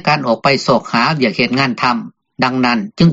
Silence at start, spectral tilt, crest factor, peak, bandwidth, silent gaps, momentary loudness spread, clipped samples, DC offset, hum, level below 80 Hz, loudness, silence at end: 0.05 s; -4 dB/octave; 14 dB; 0 dBFS; 7.8 kHz; none; 4 LU; under 0.1%; under 0.1%; none; -48 dBFS; -14 LUFS; 0 s